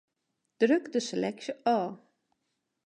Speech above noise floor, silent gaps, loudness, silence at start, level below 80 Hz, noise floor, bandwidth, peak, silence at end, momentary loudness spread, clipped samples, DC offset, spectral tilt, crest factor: 53 dB; none; -30 LUFS; 0.6 s; -82 dBFS; -81 dBFS; 10.5 kHz; -12 dBFS; 0.9 s; 7 LU; under 0.1%; under 0.1%; -5 dB/octave; 20 dB